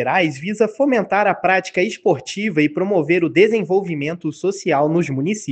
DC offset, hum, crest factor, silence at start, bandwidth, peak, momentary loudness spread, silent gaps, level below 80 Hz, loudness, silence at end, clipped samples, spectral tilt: under 0.1%; none; 16 dB; 0 s; 8.8 kHz; -2 dBFS; 7 LU; none; -64 dBFS; -18 LUFS; 0 s; under 0.1%; -6 dB/octave